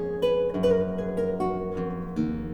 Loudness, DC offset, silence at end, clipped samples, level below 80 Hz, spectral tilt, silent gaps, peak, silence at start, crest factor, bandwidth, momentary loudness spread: -27 LUFS; under 0.1%; 0 s; under 0.1%; -46 dBFS; -8 dB/octave; none; -12 dBFS; 0 s; 14 dB; 11.5 kHz; 7 LU